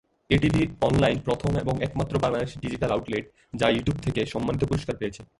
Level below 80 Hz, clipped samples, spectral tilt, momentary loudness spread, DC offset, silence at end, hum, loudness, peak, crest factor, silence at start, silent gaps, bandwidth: -42 dBFS; under 0.1%; -6.5 dB/octave; 9 LU; under 0.1%; 0.15 s; none; -26 LUFS; -6 dBFS; 20 dB; 0.3 s; none; 11.5 kHz